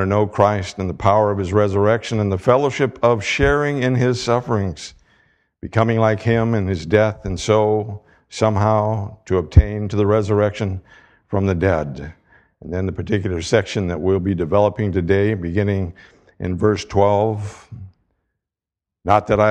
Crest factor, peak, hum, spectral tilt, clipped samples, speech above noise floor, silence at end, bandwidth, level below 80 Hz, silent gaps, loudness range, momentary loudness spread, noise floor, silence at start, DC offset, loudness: 18 dB; 0 dBFS; none; -7 dB/octave; under 0.1%; 69 dB; 0 s; 9.4 kHz; -34 dBFS; none; 4 LU; 12 LU; -86 dBFS; 0 s; under 0.1%; -19 LUFS